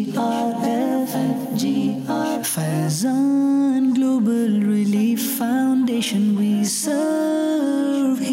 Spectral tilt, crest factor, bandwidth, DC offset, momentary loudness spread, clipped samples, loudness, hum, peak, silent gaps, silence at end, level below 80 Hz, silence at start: -5 dB/octave; 8 dB; 16 kHz; under 0.1%; 4 LU; under 0.1%; -20 LUFS; none; -12 dBFS; none; 0 s; -70 dBFS; 0 s